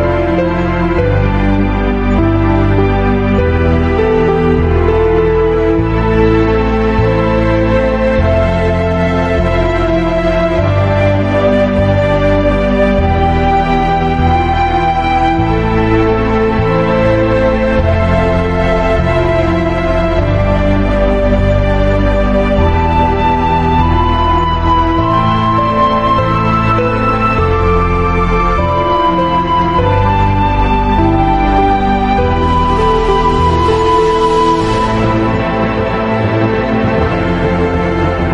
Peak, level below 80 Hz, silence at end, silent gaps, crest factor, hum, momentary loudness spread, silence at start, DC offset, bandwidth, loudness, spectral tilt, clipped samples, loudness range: 0 dBFS; -20 dBFS; 0 s; none; 10 dB; none; 2 LU; 0 s; under 0.1%; 9 kHz; -12 LUFS; -8 dB/octave; under 0.1%; 1 LU